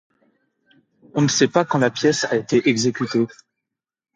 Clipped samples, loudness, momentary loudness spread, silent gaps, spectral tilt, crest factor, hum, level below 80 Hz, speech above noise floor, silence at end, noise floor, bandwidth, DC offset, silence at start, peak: under 0.1%; -19 LUFS; 5 LU; none; -4.5 dB/octave; 20 dB; none; -64 dBFS; 64 dB; 0.9 s; -83 dBFS; 9.4 kHz; under 0.1%; 1.15 s; -2 dBFS